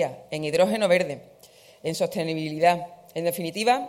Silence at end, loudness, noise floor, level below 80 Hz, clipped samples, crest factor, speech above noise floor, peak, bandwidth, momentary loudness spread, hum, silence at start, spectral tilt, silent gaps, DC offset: 0 s; -25 LUFS; -52 dBFS; -68 dBFS; under 0.1%; 18 dB; 28 dB; -6 dBFS; 16.5 kHz; 10 LU; none; 0 s; -4.5 dB/octave; none; under 0.1%